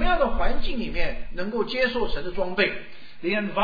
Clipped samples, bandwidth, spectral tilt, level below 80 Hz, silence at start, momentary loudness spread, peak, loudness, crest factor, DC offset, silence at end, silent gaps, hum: under 0.1%; 5 kHz; -6.5 dB/octave; -30 dBFS; 0 s; 9 LU; -8 dBFS; -26 LUFS; 14 dB; 2%; 0 s; none; none